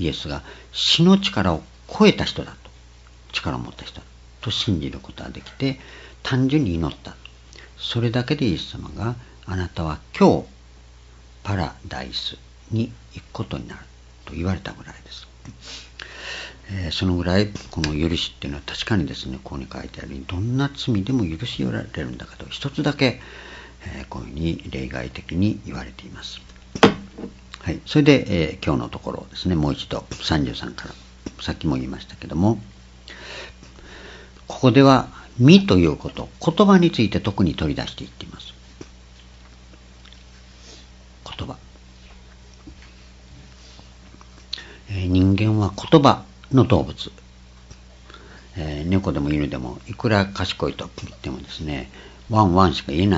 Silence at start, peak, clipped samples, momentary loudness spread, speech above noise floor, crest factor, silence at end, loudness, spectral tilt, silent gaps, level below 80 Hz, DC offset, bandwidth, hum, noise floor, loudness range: 0 s; 0 dBFS; under 0.1%; 22 LU; 25 dB; 22 dB; 0 s; -21 LUFS; -6.5 dB/octave; none; -42 dBFS; under 0.1%; 8 kHz; none; -46 dBFS; 15 LU